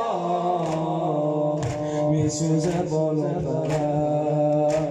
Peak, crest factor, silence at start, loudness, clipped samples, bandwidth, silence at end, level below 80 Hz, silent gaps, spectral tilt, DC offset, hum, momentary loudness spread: -12 dBFS; 12 dB; 0 s; -24 LUFS; under 0.1%; 10.5 kHz; 0 s; -52 dBFS; none; -7 dB/octave; under 0.1%; none; 3 LU